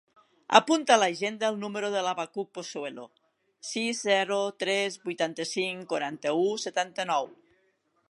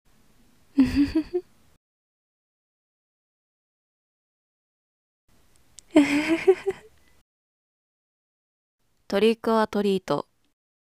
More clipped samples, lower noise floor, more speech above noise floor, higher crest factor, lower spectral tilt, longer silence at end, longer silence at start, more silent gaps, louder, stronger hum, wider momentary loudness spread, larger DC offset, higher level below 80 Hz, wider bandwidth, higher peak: neither; first, -71 dBFS vs -62 dBFS; first, 43 dB vs 39 dB; about the same, 28 dB vs 24 dB; second, -3 dB/octave vs -5.5 dB/octave; about the same, 0.75 s vs 0.75 s; second, 0.5 s vs 0.75 s; second, none vs 1.77-5.28 s, 7.21-8.78 s; second, -28 LUFS vs -24 LUFS; neither; first, 14 LU vs 11 LU; neither; second, -84 dBFS vs -52 dBFS; second, 11.5 kHz vs 15 kHz; about the same, -2 dBFS vs -4 dBFS